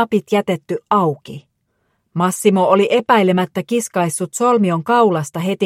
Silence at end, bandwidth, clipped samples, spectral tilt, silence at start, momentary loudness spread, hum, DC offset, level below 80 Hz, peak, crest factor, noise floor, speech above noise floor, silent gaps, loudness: 0 s; 16 kHz; under 0.1%; -5.5 dB/octave; 0 s; 9 LU; none; under 0.1%; -66 dBFS; 0 dBFS; 16 dB; -67 dBFS; 51 dB; none; -16 LUFS